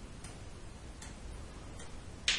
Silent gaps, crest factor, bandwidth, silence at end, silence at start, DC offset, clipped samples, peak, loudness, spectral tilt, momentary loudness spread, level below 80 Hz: none; 26 dB; 11.5 kHz; 0 s; 0 s; under 0.1%; under 0.1%; -16 dBFS; -46 LUFS; -1.5 dB/octave; 3 LU; -50 dBFS